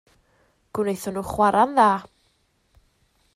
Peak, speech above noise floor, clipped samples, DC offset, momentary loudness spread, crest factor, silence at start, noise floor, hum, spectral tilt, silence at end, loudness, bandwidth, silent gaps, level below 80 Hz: -4 dBFS; 46 dB; under 0.1%; under 0.1%; 11 LU; 20 dB; 0.75 s; -66 dBFS; none; -5.5 dB/octave; 1.3 s; -21 LUFS; 15.5 kHz; none; -54 dBFS